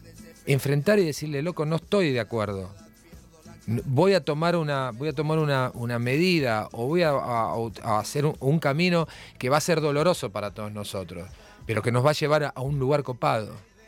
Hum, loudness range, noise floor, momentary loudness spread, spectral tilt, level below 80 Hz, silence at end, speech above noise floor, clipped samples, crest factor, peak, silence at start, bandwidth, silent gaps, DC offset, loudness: none; 2 LU; -50 dBFS; 11 LU; -6 dB/octave; -54 dBFS; 0.25 s; 25 dB; under 0.1%; 18 dB; -8 dBFS; 0.05 s; 17 kHz; none; under 0.1%; -25 LUFS